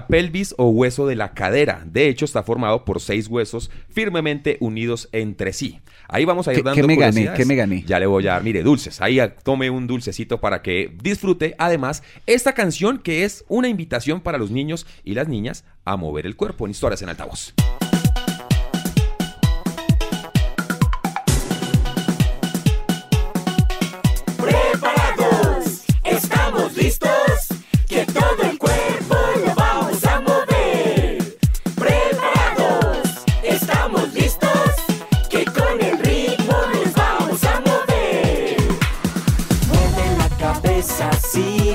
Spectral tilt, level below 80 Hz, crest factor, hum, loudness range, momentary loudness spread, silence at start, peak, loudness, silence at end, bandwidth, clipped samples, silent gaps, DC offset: -5.5 dB/octave; -26 dBFS; 16 dB; none; 5 LU; 7 LU; 0 s; -2 dBFS; -19 LUFS; 0 s; 16.5 kHz; under 0.1%; none; under 0.1%